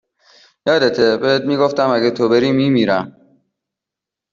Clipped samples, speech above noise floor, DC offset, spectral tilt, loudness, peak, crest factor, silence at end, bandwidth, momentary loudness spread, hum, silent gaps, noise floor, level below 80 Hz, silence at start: under 0.1%; 70 dB; under 0.1%; -6 dB/octave; -15 LUFS; -2 dBFS; 14 dB; 1.25 s; 7.4 kHz; 5 LU; none; none; -85 dBFS; -58 dBFS; 0.65 s